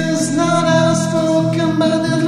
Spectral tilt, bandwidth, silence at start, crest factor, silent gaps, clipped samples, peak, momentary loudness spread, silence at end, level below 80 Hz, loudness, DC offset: -5.5 dB/octave; 13 kHz; 0 s; 12 dB; none; under 0.1%; -2 dBFS; 3 LU; 0 s; -52 dBFS; -15 LUFS; under 0.1%